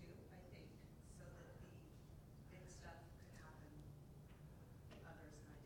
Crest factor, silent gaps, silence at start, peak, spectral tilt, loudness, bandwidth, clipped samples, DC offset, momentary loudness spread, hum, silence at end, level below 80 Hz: 14 dB; none; 0 s; -46 dBFS; -6 dB/octave; -61 LUFS; 18 kHz; under 0.1%; under 0.1%; 3 LU; none; 0 s; -66 dBFS